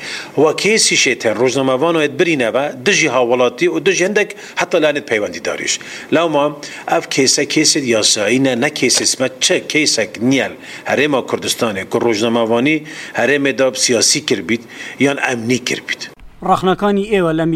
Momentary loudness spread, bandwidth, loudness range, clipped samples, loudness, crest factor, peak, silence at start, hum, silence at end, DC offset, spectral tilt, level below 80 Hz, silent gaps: 8 LU; 15.5 kHz; 3 LU; under 0.1%; -14 LUFS; 16 dB; 0 dBFS; 0 s; none; 0 s; under 0.1%; -3 dB/octave; -52 dBFS; none